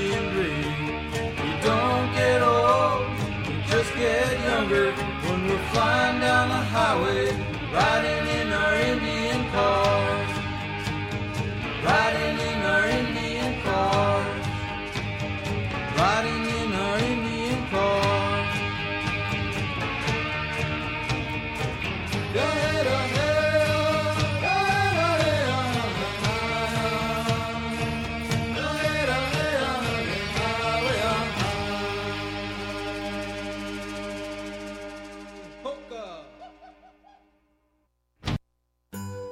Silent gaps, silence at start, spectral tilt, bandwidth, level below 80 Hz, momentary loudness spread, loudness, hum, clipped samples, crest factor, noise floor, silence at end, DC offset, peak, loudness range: none; 0 s; -5 dB/octave; 16 kHz; -42 dBFS; 11 LU; -25 LUFS; none; under 0.1%; 16 dB; -73 dBFS; 0 s; under 0.1%; -8 dBFS; 11 LU